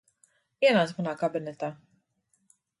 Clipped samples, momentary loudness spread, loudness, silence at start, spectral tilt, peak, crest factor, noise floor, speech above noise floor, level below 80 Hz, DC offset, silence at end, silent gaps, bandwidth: under 0.1%; 14 LU; -27 LUFS; 0.6 s; -6 dB/octave; -10 dBFS; 20 dB; -73 dBFS; 47 dB; -78 dBFS; under 0.1%; 1.05 s; none; 11.5 kHz